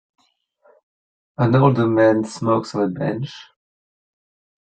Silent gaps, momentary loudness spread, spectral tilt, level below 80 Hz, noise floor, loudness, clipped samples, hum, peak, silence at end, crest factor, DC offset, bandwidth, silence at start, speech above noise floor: none; 16 LU; -7.5 dB/octave; -58 dBFS; -61 dBFS; -18 LUFS; under 0.1%; none; -2 dBFS; 1.2 s; 18 dB; under 0.1%; 9 kHz; 1.4 s; 43 dB